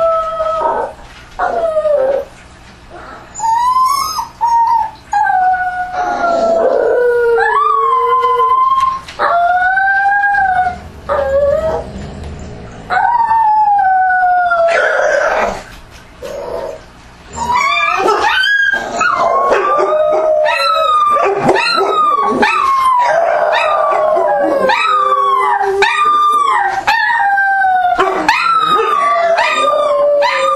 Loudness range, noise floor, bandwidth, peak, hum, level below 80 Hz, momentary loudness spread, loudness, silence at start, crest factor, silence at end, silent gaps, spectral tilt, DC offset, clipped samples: 4 LU; -37 dBFS; 14 kHz; 0 dBFS; none; -40 dBFS; 9 LU; -12 LUFS; 0 s; 12 dB; 0 s; none; -3 dB/octave; under 0.1%; under 0.1%